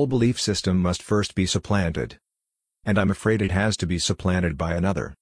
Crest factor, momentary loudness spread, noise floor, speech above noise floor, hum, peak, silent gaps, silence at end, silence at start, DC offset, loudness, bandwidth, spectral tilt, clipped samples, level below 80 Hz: 16 dB; 4 LU; -84 dBFS; 61 dB; none; -6 dBFS; none; 0.1 s; 0 s; under 0.1%; -23 LUFS; 10.5 kHz; -5 dB/octave; under 0.1%; -42 dBFS